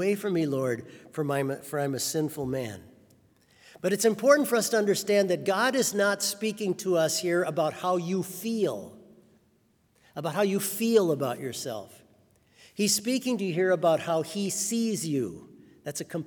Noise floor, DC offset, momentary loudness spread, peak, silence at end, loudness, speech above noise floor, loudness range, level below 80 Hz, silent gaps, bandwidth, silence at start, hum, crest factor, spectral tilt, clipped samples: -67 dBFS; under 0.1%; 12 LU; -6 dBFS; 0 s; -27 LUFS; 40 dB; 6 LU; -72 dBFS; none; over 20 kHz; 0 s; none; 22 dB; -4 dB/octave; under 0.1%